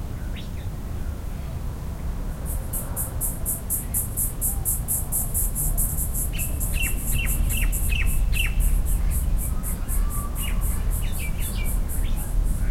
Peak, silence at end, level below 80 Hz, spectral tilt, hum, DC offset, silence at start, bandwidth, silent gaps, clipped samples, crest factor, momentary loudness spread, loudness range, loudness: -10 dBFS; 0 s; -26 dBFS; -3.5 dB/octave; none; under 0.1%; 0 s; 16.5 kHz; none; under 0.1%; 14 dB; 9 LU; 4 LU; -26 LUFS